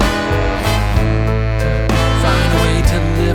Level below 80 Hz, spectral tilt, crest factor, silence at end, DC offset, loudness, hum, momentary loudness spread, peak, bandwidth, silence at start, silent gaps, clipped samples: -18 dBFS; -6 dB/octave; 14 dB; 0 s; under 0.1%; -15 LUFS; none; 3 LU; 0 dBFS; 17 kHz; 0 s; none; under 0.1%